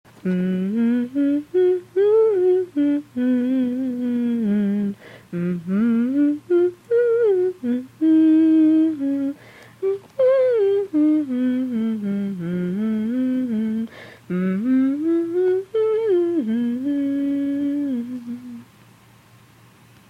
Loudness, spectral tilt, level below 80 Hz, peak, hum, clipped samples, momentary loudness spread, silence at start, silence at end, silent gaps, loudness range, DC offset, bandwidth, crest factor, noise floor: -20 LUFS; -9 dB/octave; -66 dBFS; -10 dBFS; none; under 0.1%; 9 LU; 0.25 s; 1.45 s; none; 5 LU; under 0.1%; 6.2 kHz; 10 dB; -50 dBFS